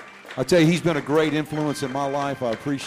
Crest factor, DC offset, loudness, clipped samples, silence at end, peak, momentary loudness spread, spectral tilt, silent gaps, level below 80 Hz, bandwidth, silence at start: 16 dB; under 0.1%; -22 LUFS; under 0.1%; 0 s; -8 dBFS; 8 LU; -6 dB/octave; none; -56 dBFS; 15.5 kHz; 0 s